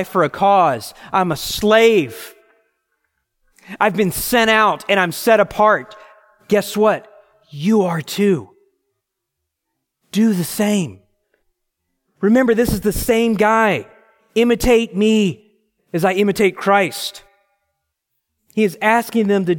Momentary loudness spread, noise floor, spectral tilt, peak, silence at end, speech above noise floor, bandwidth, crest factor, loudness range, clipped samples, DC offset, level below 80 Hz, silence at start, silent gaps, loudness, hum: 10 LU; -78 dBFS; -5 dB/octave; 0 dBFS; 0 s; 62 dB; 17 kHz; 18 dB; 5 LU; under 0.1%; under 0.1%; -42 dBFS; 0 s; none; -16 LUFS; none